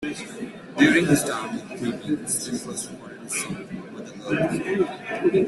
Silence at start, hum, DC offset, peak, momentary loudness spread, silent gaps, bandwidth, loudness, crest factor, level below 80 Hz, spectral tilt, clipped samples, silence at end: 0 s; none; under 0.1%; -4 dBFS; 17 LU; none; 12.5 kHz; -24 LUFS; 20 dB; -58 dBFS; -4.5 dB/octave; under 0.1%; 0 s